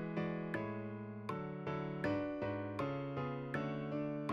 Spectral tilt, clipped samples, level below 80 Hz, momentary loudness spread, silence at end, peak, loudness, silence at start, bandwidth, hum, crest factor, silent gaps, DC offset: -8.5 dB/octave; under 0.1%; -68 dBFS; 5 LU; 0 s; -26 dBFS; -41 LUFS; 0 s; 10.5 kHz; none; 14 dB; none; under 0.1%